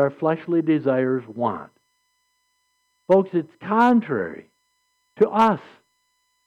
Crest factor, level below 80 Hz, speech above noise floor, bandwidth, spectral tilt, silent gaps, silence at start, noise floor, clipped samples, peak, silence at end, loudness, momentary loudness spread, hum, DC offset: 16 dB; -68 dBFS; 49 dB; 8.6 kHz; -8 dB/octave; none; 0 s; -70 dBFS; under 0.1%; -8 dBFS; 0.85 s; -21 LUFS; 10 LU; none; under 0.1%